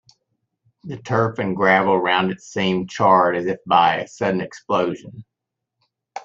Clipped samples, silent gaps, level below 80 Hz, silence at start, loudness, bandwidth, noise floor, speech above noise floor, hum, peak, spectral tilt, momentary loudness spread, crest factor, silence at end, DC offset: under 0.1%; none; -62 dBFS; 0.85 s; -19 LUFS; 7.8 kHz; -82 dBFS; 63 dB; none; -2 dBFS; -5.5 dB/octave; 10 LU; 18 dB; 0.05 s; under 0.1%